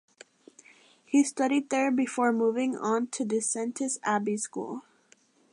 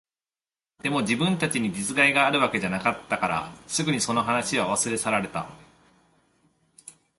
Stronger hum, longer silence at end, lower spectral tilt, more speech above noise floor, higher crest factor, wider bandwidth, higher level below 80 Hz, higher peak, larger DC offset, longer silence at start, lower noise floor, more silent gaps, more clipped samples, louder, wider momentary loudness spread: neither; first, 0.75 s vs 0.25 s; about the same, -4 dB/octave vs -3.5 dB/octave; second, 36 dB vs over 65 dB; about the same, 16 dB vs 20 dB; about the same, 11 kHz vs 12 kHz; second, -84 dBFS vs -60 dBFS; second, -12 dBFS vs -6 dBFS; neither; first, 1.1 s vs 0.85 s; second, -63 dBFS vs under -90 dBFS; neither; neither; second, -28 LUFS vs -24 LUFS; about the same, 7 LU vs 9 LU